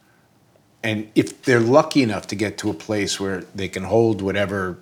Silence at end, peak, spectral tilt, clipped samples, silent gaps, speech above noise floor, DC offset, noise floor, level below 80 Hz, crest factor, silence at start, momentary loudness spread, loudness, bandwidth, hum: 0.05 s; 0 dBFS; -5.5 dB/octave; under 0.1%; none; 37 dB; under 0.1%; -57 dBFS; -58 dBFS; 20 dB; 0.85 s; 12 LU; -21 LUFS; 17 kHz; none